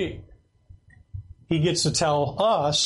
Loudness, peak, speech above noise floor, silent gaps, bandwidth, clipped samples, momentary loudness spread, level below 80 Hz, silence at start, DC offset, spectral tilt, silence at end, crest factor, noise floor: -23 LUFS; -12 dBFS; 30 dB; none; 11.5 kHz; under 0.1%; 21 LU; -50 dBFS; 0 s; under 0.1%; -4 dB/octave; 0 s; 14 dB; -53 dBFS